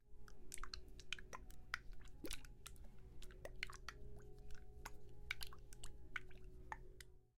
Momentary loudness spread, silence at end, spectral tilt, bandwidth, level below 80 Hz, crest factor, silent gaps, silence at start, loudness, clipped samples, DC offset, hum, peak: 12 LU; 0.1 s; -2.5 dB/octave; 16 kHz; -58 dBFS; 28 dB; none; 0.05 s; -55 LUFS; under 0.1%; under 0.1%; none; -24 dBFS